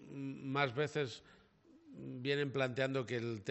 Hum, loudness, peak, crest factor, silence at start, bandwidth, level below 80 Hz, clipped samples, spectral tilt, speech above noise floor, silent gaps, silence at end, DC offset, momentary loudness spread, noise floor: none; -38 LUFS; -18 dBFS; 22 dB; 0 s; 8.2 kHz; -78 dBFS; under 0.1%; -6 dB/octave; 28 dB; none; 0 s; under 0.1%; 15 LU; -65 dBFS